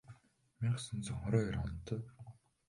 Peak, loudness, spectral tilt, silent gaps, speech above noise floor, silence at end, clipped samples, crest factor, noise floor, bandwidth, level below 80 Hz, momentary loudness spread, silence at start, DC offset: -18 dBFS; -39 LUFS; -6.5 dB/octave; none; 27 dB; 0.35 s; under 0.1%; 22 dB; -64 dBFS; 11.5 kHz; -54 dBFS; 18 LU; 0.1 s; under 0.1%